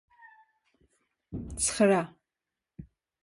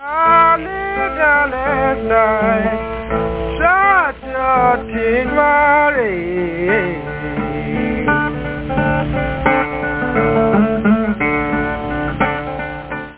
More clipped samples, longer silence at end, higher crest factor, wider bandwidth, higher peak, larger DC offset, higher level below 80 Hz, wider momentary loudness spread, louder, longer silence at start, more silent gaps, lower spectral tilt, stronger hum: neither; first, 0.4 s vs 0 s; first, 20 dB vs 14 dB; first, 11.5 kHz vs 4 kHz; second, -12 dBFS vs -2 dBFS; second, under 0.1% vs 0.3%; second, -54 dBFS vs -32 dBFS; first, 18 LU vs 10 LU; second, -27 LUFS vs -16 LUFS; first, 1.3 s vs 0 s; neither; second, -4 dB/octave vs -10 dB/octave; neither